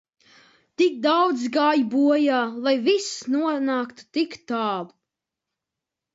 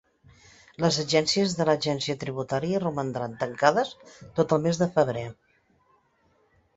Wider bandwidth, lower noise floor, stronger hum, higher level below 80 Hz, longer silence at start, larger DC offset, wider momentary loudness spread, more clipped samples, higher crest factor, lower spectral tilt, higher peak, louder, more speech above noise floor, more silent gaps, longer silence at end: about the same, 8 kHz vs 8.2 kHz; first, -86 dBFS vs -66 dBFS; neither; second, -76 dBFS vs -60 dBFS; about the same, 0.8 s vs 0.8 s; neither; about the same, 8 LU vs 9 LU; neither; second, 16 dB vs 24 dB; second, -3.5 dB/octave vs -5 dB/octave; second, -8 dBFS vs -4 dBFS; first, -22 LUFS vs -26 LUFS; first, 64 dB vs 41 dB; neither; second, 1.25 s vs 1.45 s